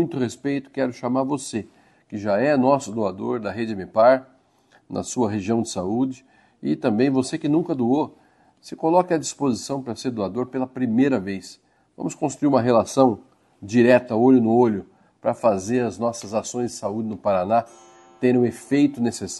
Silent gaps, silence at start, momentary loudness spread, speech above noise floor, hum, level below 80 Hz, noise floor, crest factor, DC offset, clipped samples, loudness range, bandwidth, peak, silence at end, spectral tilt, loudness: none; 0 s; 13 LU; 37 dB; none; -64 dBFS; -59 dBFS; 20 dB; under 0.1%; under 0.1%; 5 LU; 12 kHz; -2 dBFS; 0 s; -6 dB/octave; -22 LUFS